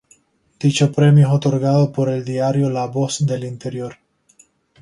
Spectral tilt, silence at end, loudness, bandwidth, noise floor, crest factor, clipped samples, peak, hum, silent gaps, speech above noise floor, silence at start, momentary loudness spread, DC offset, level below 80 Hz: -6.5 dB/octave; 0.9 s; -17 LUFS; 11 kHz; -56 dBFS; 16 dB; under 0.1%; -2 dBFS; none; none; 39 dB; 0.6 s; 15 LU; under 0.1%; -58 dBFS